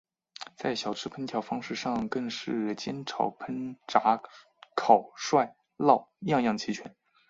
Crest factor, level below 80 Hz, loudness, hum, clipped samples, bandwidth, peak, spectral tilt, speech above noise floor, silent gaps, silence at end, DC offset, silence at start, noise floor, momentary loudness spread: 26 dB; -70 dBFS; -29 LUFS; none; under 0.1%; 7.8 kHz; -4 dBFS; -5 dB/octave; 19 dB; none; 0.4 s; under 0.1%; 0.4 s; -48 dBFS; 12 LU